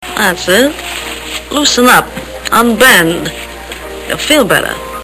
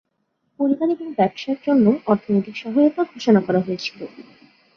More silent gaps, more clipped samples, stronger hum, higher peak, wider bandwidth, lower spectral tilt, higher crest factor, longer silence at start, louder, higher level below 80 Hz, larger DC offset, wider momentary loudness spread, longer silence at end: neither; first, 0.8% vs under 0.1%; neither; first, 0 dBFS vs -4 dBFS; first, over 20 kHz vs 6.8 kHz; second, -2.5 dB/octave vs -7.5 dB/octave; second, 12 dB vs 18 dB; second, 0 s vs 0.6 s; first, -10 LUFS vs -20 LUFS; first, -34 dBFS vs -64 dBFS; neither; first, 18 LU vs 10 LU; second, 0 s vs 0.55 s